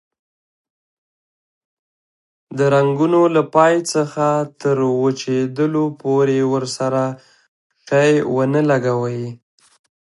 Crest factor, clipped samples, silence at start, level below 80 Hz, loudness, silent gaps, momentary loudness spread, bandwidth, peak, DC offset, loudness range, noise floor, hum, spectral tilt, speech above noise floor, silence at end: 18 dB; under 0.1%; 2.5 s; -66 dBFS; -17 LUFS; 7.48-7.70 s; 7 LU; 11.5 kHz; 0 dBFS; under 0.1%; 3 LU; under -90 dBFS; none; -6 dB/octave; over 74 dB; 0.75 s